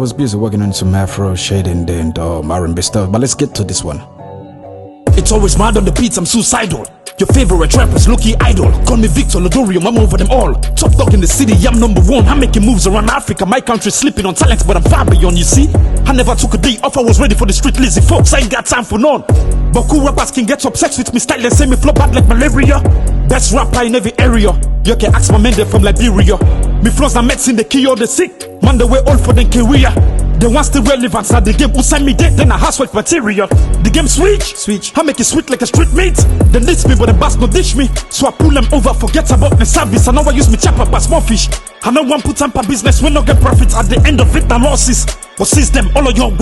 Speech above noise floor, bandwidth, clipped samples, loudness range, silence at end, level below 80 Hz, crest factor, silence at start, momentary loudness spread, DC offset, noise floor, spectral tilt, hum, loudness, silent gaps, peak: 22 dB; 12.5 kHz; under 0.1%; 3 LU; 0 s; -12 dBFS; 8 dB; 0 s; 5 LU; under 0.1%; -30 dBFS; -5 dB/octave; none; -10 LUFS; none; 0 dBFS